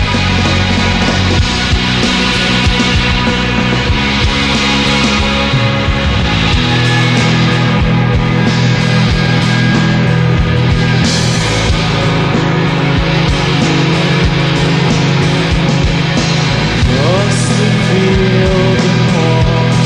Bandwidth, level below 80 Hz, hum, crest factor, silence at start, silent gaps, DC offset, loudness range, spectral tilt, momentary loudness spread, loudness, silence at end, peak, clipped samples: 11 kHz; -22 dBFS; none; 10 dB; 0 s; none; under 0.1%; 1 LU; -5.5 dB/octave; 2 LU; -11 LUFS; 0 s; 0 dBFS; under 0.1%